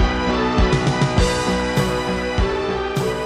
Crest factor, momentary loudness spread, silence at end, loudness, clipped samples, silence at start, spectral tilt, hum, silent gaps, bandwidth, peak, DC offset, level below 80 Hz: 14 dB; 4 LU; 0 s; -19 LUFS; under 0.1%; 0 s; -5.5 dB/octave; none; none; 15 kHz; -4 dBFS; under 0.1%; -26 dBFS